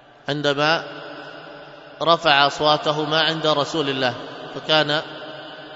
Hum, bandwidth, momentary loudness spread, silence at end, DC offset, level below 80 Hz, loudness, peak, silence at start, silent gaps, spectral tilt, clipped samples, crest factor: none; 8 kHz; 20 LU; 0 s; under 0.1%; -62 dBFS; -19 LUFS; 0 dBFS; 0.25 s; none; -4 dB/octave; under 0.1%; 22 dB